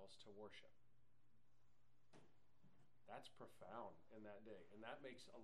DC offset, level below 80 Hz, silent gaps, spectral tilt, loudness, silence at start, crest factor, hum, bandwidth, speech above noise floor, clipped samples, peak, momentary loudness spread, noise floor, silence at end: under 0.1%; -90 dBFS; none; -4.5 dB/octave; -61 LUFS; 0 s; 24 dB; none; 11.5 kHz; 22 dB; under 0.1%; -40 dBFS; 6 LU; -83 dBFS; 0 s